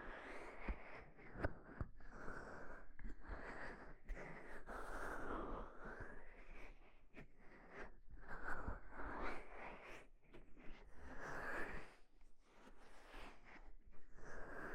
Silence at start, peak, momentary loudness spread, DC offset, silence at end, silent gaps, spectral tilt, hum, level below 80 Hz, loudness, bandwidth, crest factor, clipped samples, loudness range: 0 s; -28 dBFS; 15 LU; under 0.1%; 0 s; none; -6 dB/octave; none; -56 dBFS; -54 LUFS; 10.5 kHz; 22 dB; under 0.1%; 3 LU